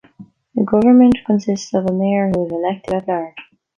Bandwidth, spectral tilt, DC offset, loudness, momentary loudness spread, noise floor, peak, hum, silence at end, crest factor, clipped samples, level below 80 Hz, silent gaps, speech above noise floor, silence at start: 7.4 kHz; -7.5 dB/octave; under 0.1%; -16 LUFS; 12 LU; -43 dBFS; -2 dBFS; none; 0.35 s; 14 dB; under 0.1%; -48 dBFS; none; 28 dB; 0.2 s